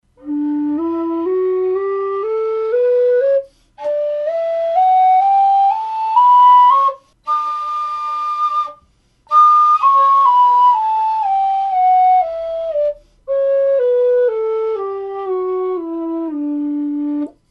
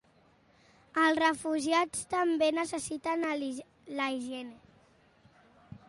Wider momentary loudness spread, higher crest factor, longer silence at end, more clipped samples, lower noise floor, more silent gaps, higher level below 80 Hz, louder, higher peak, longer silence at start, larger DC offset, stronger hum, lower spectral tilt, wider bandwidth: about the same, 12 LU vs 13 LU; second, 12 dB vs 18 dB; about the same, 0.2 s vs 0.1 s; neither; second, -55 dBFS vs -65 dBFS; neither; first, -58 dBFS vs -70 dBFS; first, -15 LUFS vs -31 LUFS; first, -2 dBFS vs -14 dBFS; second, 0.25 s vs 0.95 s; neither; neither; first, -5.5 dB/octave vs -3 dB/octave; second, 7 kHz vs 11.5 kHz